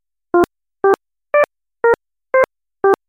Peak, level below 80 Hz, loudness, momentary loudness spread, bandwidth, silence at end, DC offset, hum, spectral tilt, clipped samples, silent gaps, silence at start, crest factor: 0 dBFS; -52 dBFS; -18 LUFS; 4 LU; 16.5 kHz; 0.15 s; under 0.1%; none; -6 dB/octave; under 0.1%; none; 0.35 s; 18 dB